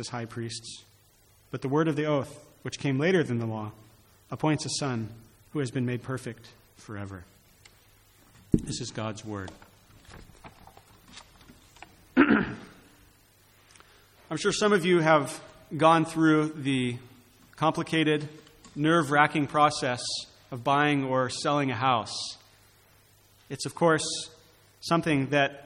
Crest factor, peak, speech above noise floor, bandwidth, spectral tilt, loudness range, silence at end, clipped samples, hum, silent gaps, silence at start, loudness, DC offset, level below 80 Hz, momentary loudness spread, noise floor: 24 dB; -6 dBFS; 34 dB; 16 kHz; -5 dB/octave; 11 LU; 0 s; under 0.1%; none; none; 0 s; -27 LUFS; under 0.1%; -56 dBFS; 19 LU; -61 dBFS